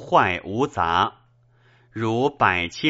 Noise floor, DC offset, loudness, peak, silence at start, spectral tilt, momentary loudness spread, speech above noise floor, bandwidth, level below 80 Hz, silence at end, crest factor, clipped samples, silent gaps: -58 dBFS; under 0.1%; -22 LUFS; -2 dBFS; 0 s; -3 dB/octave; 7 LU; 37 dB; 8 kHz; -52 dBFS; 0 s; 20 dB; under 0.1%; none